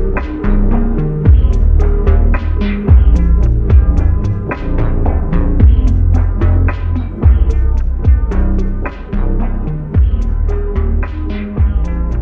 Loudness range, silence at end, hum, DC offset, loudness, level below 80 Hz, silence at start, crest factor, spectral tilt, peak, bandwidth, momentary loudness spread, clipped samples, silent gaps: 5 LU; 0 s; none; under 0.1%; -14 LUFS; -12 dBFS; 0 s; 10 dB; -10 dB/octave; 0 dBFS; 4 kHz; 8 LU; under 0.1%; none